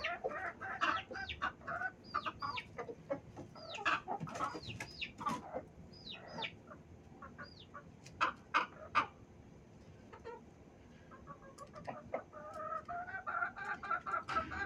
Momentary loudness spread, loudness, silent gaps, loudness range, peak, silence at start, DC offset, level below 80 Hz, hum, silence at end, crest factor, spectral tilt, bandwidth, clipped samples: 20 LU; -41 LUFS; none; 7 LU; -18 dBFS; 0 s; under 0.1%; -68 dBFS; none; 0 s; 24 dB; -4 dB/octave; 14.5 kHz; under 0.1%